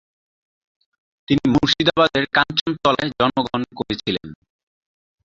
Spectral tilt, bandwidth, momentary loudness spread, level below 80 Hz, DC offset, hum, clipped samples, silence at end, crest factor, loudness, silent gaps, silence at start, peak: -5 dB/octave; 7.6 kHz; 10 LU; -48 dBFS; under 0.1%; none; under 0.1%; 0.9 s; 20 dB; -19 LUFS; 2.61-2.66 s; 1.3 s; -2 dBFS